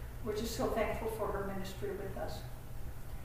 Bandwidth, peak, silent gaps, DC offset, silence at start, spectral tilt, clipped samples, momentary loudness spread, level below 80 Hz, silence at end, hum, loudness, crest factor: 15.5 kHz; -20 dBFS; none; under 0.1%; 0 s; -5.5 dB/octave; under 0.1%; 13 LU; -46 dBFS; 0 s; none; -39 LUFS; 18 dB